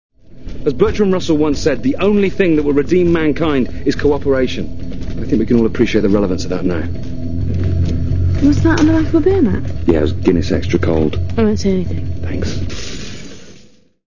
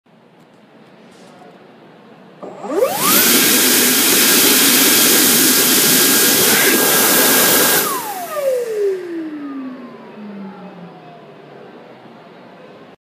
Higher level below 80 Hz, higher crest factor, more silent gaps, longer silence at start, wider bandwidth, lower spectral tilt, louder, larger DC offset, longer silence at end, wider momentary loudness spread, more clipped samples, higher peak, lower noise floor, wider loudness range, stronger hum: first, -26 dBFS vs -64 dBFS; about the same, 14 dB vs 16 dB; neither; second, 0.1 s vs 2.4 s; second, 7.4 kHz vs 15.5 kHz; first, -7 dB/octave vs -1 dB/octave; second, -16 LUFS vs -11 LUFS; first, 8% vs under 0.1%; second, 0 s vs 0.15 s; second, 12 LU vs 20 LU; neither; about the same, 0 dBFS vs 0 dBFS; about the same, -46 dBFS vs -47 dBFS; second, 3 LU vs 15 LU; neither